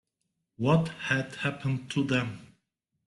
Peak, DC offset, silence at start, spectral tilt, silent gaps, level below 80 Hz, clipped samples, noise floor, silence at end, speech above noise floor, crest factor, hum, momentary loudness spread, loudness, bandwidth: -12 dBFS; under 0.1%; 0.6 s; -6.5 dB/octave; none; -62 dBFS; under 0.1%; -81 dBFS; 0.6 s; 53 dB; 18 dB; none; 7 LU; -29 LUFS; 11.5 kHz